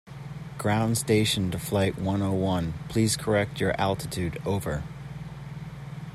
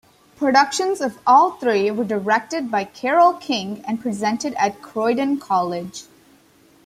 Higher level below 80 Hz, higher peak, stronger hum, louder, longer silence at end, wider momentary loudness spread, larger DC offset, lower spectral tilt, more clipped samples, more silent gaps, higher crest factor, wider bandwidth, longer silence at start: first, -48 dBFS vs -64 dBFS; second, -10 dBFS vs -2 dBFS; neither; second, -27 LUFS vs -20 LUFS; second, 0 s vs 0.85 s; first, 16 LU vs 10 LU; neither; about the same, -5 dB/octave vs -4 dB/octave; neither; neither; about the same, 16 dB vs 18 dB; about the same, 14.5 kHz vs 15.5 kHz; second, 0.05 s vs 0.4 s